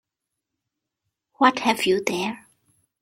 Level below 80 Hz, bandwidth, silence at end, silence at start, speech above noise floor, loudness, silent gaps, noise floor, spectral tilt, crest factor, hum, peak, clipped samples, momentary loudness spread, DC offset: -68 dBFS; 16.5 kHz; 0.65 s; 1.4 s; 63 dB; -22 LUFS; none; -84 dBFS; -3.5 dB/octave; 24 dB; none; -2 dBFS; under 0.1%; 11 LU; under 0.1%